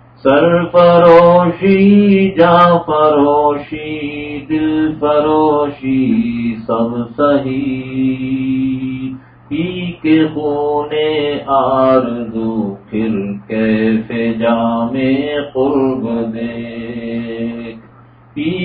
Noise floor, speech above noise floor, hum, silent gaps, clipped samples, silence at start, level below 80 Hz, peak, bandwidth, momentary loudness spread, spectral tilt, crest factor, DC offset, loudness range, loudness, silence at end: -42 dBFS; 30 dB; none; none; under 0.1%; 0.25 s; -44 dBFS; 0 dBFS; 5.2 kHz; 13 LU; -9.5 dB/octave; 14 dB; under 0.1%; 8 LU; -14 LUFS; 0 s